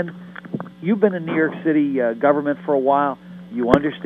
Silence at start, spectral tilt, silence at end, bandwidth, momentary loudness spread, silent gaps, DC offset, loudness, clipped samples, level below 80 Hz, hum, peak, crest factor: 0 s; -8.5 dB/octave; 0 s; 5.6 kHz; 14 LU; none; under 0.1%; -20 LUFS; under 0.1%; -52 dBFS; none; 0 dBFS; 20 dB